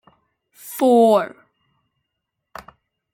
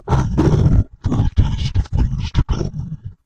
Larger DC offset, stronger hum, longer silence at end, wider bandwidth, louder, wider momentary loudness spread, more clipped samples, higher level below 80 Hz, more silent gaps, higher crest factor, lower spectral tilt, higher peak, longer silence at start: second, under 0.1% vs 3%; neither; first, 1.85 s vs 0 s; first, 17 kHz vs 8 kHz; first, -16 LUFS vs -19 LUFS; first, 27 LU vs 9 LU; neither; second, -66 dBFS vs -22 dBFS; neither; about the same, 18 dB vs 14 dB; second, -5.5 dB/octave vs -8 dB/octave; about the same, -4 dBFS vs -4 dBFS; first, 0.65 s vs 0 s